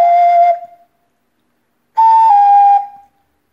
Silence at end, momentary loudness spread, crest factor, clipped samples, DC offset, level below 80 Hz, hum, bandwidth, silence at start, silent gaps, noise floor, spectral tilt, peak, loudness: 0.65 s; 14 LU; 12 dB; under 0.1%; under 0.1%; -76 dBFS; none; 5.8 kHz; 0 s; none; -64 dBFS; -1.5 dB/octave; 0 dBFS; -10 LUFS